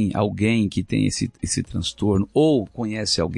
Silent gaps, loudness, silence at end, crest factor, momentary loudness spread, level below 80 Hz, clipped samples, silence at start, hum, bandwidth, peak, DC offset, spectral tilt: none; -22 LUFS; 0 s; 14 dB; 7 LU; -46 dBFS; under 0.1%; 0 s; none; 11.5 kHz; -6 dBFS; under 0.1%; -5 dB/octave